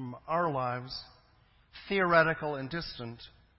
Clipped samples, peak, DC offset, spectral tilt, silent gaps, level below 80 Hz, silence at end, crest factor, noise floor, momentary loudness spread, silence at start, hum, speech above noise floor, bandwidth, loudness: under 0.1%; -10 dBFS; under 0.1%; -9 dB/octave; none; -60 dBFS; 0.3 s; 22 dB; -64 dBFS; 18 LU; 0 s; none; 33 dB; 5.8 kHz; -30 LUFS